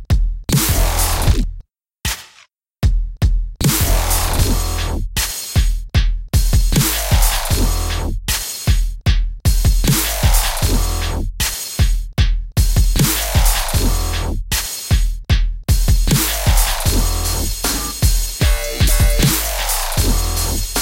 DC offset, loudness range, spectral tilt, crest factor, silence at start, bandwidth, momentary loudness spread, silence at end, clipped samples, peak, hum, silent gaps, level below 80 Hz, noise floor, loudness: under 0.1%; 2 LU; -3.5 dB/octave; 14 dB; 0 s; 17 kHz; 5 LU; 0 s; under 0.1%; -2 dBFS; none; none; -18 dBFS; -50 dBFS; -17 LUFS